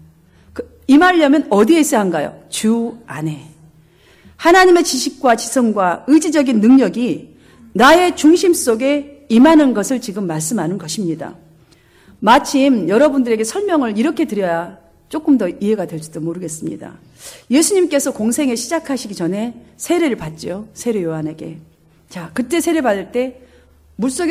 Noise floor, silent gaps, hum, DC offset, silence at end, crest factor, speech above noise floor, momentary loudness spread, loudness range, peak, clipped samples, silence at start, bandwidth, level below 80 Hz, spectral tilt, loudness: -49 dBFS; none; none; under 0.1%; 0 s; 16 dB; 35 dB; 16 LU; 8 LU; 0 dBFS; under 0.1%; 0.55 s; 16 kHz; -50 dBFS; -4.5 dB/octave; -15 LUFS